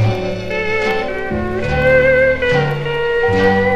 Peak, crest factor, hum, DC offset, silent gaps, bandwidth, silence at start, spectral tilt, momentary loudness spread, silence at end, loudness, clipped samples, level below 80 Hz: 0 dBFS; 14 dB; none; under 0.1%; none; 9.4 kHz; 0 s; -6.5 dB/octave; 9 LU; 0 s; -15 LUFS; under 0.1%; -32 dBFS